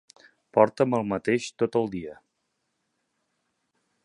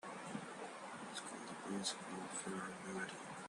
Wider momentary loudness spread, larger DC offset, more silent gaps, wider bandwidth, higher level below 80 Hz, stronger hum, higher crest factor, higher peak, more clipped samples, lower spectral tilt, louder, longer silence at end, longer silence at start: first, 12 LU vs 7 LU; neither; neither; about the same, 11 kHz vs 12 kHz; first, -64 dBFS vs -84 dBFS; neither; about the same, 24 dB vs 20 dB; first, -4 dBFS vs -28 dBFS; neither; first, -6 dB/octave vs -3 dB/octave; first, -25 LUFS vs -46 LUFS; first, 1.9 s vs 0 s; first, 0.55 s vs 0.05 s